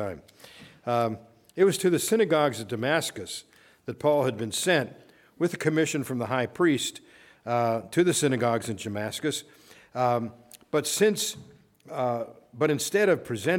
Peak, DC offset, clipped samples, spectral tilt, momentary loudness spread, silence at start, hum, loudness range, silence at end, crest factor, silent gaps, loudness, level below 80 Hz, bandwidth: -8 dBFS; under 0.1%; under 0.1%; -4.5 dB/octave; 15 LU; 0 s; none; 2 LU; 0 s; 18 dB; none; -26 LUFS; -70 dBFS; 18 kHz